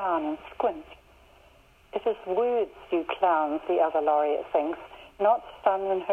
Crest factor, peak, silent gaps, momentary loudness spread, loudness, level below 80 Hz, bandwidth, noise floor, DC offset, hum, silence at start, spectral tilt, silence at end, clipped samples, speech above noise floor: 18 dB; -10 dBFS; none; 9 LU; -27 LUFS; -62 dBFS; 5.8 kHz; -57 dBFS; under 0.1%; none; 0 s; -6.5 dB/octave; 0 s; under 0.1%; 31 dB